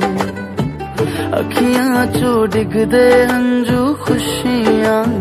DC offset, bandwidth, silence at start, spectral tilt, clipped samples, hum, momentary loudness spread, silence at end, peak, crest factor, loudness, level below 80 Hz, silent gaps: under 0.1%; 15 kHz; 0 s; -5.5 dB/octave; under 0.1%; none; 10 LU; 0 s; 0 dBFS; 14 dB; -14 LUFS; -40 dBFS; none